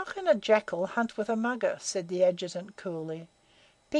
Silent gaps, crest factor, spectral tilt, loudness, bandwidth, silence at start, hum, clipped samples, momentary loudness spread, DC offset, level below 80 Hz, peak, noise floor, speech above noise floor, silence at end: none; 20 dB; -4.5 dB/octave; -29 LUFS; 11 kHz; 0 s; none; under 0.1%; 12 LU; under 0.1%; -72 dBFS; -10 dBFS; -63 dBFS; 33 dB; 0 s